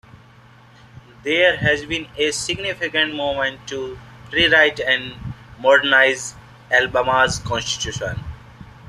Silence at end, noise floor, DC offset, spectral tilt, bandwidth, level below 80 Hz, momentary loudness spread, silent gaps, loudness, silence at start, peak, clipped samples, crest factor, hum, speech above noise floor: 0 s; -47 dBFS; under 0.1%; -3 dB/octave; 13.5 kHz; -46 dBFS; 18 LU; none; -18 LUFS; 0.15 s; -2 dBFS; under 0.1%; 20 dB; none; 28 dB